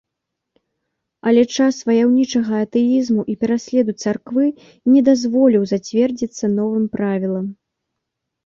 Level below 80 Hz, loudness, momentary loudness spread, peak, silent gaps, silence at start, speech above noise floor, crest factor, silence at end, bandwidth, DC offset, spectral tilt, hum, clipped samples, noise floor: -60 dBFS; -17 LUFS; 8 LU; -4 dBFS; none; 1.25 s; 63 dB; 14 dB; 0.95 s; 7.4 kHz; under 0.1%; -6 dB/octave; none; under 0.1%; -80 dBFS